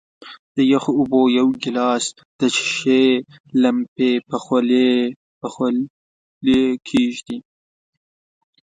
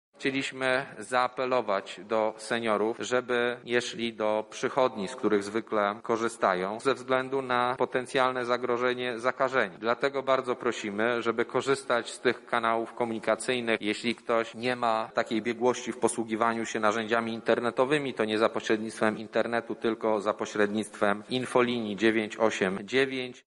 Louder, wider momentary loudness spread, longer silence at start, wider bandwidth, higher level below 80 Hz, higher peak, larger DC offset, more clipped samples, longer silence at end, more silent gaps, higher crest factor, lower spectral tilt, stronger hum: first, -18 LUFS vs -28 LUFS; first, 11 LU vs 4 LU; about the same, 0.2 s vs 0.2 s; second, 9.4 kHz vs 11.5 kHz; first, -58 dBFS vs -70 dBFS; first, -2 dBFS vs -8 dBFS; neither; neither; first, 1.25 s vs 0.05 s; first, 0.39-0.55 s, 2.25-2.39 s, 3.40-3.44 s, 3.88-3.96 s, 5.16-5.41 s, 5.90-6.41 s vs none; about the same, 16 dB vs 20 dB; about the same, -4.5 dB/octave vs -4 dB/octave; neither